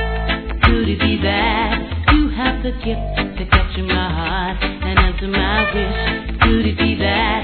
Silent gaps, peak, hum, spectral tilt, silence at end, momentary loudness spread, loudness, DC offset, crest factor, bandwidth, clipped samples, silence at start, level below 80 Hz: none; 0 dBFS; none; -9 dB/octave; 0 s; 7 LU; -17 LUFS; 0.4%; 16 dB; 4.6 kHz; under 0.1%; 0 s; -22 dBFS